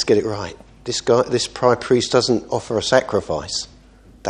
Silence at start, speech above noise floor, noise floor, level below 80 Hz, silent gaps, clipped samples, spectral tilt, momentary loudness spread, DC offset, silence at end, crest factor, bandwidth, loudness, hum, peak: 0 s; 28 dB; -47 dBFS; -48 dBFS; none; under 0.1%; -4 dB/octave; 11 LU; under 0.1%; 0 s; 20 dB; 11 kHz; -19 LUFS; none; 0 dBFS